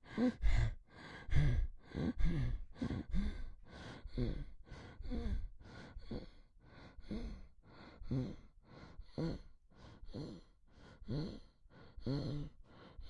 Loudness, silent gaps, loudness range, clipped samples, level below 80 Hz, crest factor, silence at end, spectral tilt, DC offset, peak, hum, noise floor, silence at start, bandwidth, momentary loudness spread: -43 LUFS; none; 8 LU; under 0.1%; -44 dBFS; 22 dB; 0 s; -8 dB/octave; under 0.1%; -18 dBFS; none; -62 dBFS; 0.05 s; 7.8 kHz; 22 LU